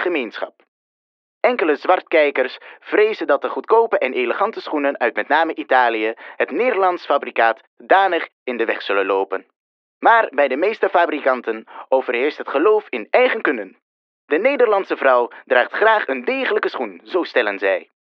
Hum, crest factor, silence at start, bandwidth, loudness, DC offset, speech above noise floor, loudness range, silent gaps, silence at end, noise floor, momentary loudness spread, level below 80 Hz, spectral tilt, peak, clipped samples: none; 18 dB; 0 s; 6.2 kHz; -18 LUFS; under 0.1%; over 72 dB; 2 LU; 0.68-1.41 s, 7.67-7.77 s, 8.33-8.46 s, 9.56-10.01 s, 13.82-14.28 s; 0.2 s; under -90 dBFS; 8 LU; -90 dBFS; -5 dB/octave; -2 dBFS; under 0.1%